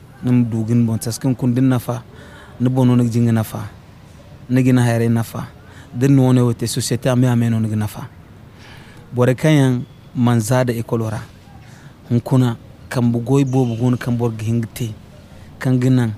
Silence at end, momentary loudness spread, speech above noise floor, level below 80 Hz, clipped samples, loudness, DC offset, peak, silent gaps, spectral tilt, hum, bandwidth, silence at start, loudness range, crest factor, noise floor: 0 s; 13 LU; 25 dB; -48 dBFS; under 0.1%; -17 LUFS; under 0.1%; -2 dBFS; none; -7 dB/octave; none; 15 kHz; 0.2 s; 2 LU; 16 dB; -41 dBFS